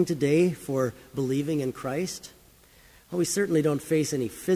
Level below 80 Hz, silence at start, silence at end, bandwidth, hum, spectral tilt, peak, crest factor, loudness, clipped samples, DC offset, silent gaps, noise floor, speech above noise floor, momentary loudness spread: -60 dBFS; 0 s; 0 s; 16 kHz; none; -5.5 dB/octave; -12 dBFS; 16 dB; -27 LUFS; under 0.1%; under 0.1%; none; -55 dBFS; 29 dB; 10 LU